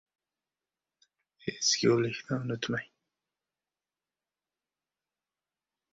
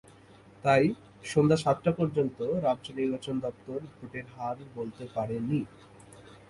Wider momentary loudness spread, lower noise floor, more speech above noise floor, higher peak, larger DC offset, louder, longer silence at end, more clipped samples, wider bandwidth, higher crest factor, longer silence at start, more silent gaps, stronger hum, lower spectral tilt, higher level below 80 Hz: about the same, 13 LU vs 15 LU; first, under -90 dBFS vs -55 dBFS; first, over 60 dB vs 26 dB; about the same, -12 dBFS vs -10 dBFS; neither; about the same, -30 LUFS vs -30 LUFS; first, 3.1 s vs 0.1 s; neither; second, 7.8 kHz vs 11.5 kHz; about the same, 24 dB vs 20 dB; first, 1.45 s vs 0.65 s; neither; neither; second, -3.5 dB/octave vs -7 dB/octave; second, -72 dBFS vs -62 dBFS